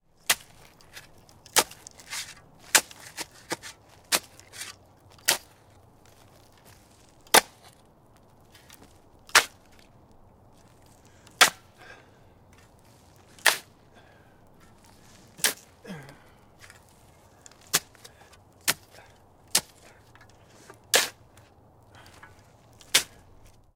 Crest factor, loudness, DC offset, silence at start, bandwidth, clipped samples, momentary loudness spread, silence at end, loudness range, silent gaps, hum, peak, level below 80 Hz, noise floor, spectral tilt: 32 dB; -25 LUFS; under 0.1%; 0.3 s; 17.5 kHz; under 0.1%; 26 LU; 0.7 s; 7 LU; none; none; -2 dBFS; -64 dBFS; -57 dBFS; 0.5 dB/octave